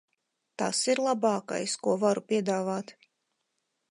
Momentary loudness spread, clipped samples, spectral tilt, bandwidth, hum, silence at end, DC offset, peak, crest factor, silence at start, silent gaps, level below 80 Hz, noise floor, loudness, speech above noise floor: 9 LU; under 0.1%; -4 dB/octave; 11.5 kHz; none; 1 s; under 0.1%; -14 dBFS; 16 dB; 0.6 s; none; -84 dBFS; -80 dBFS; -28 LUFS; 52 dB